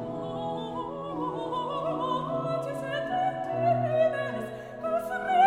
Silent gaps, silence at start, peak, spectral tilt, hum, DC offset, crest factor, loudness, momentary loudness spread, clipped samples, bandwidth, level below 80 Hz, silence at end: none; 0 s; -12 dBFS; -6.5 dB/octave; none; under 0.1%; 18 dB; -30 LUFS; 9 LU; under 0.1%; 16 kHz; -62 dBFS; 0 s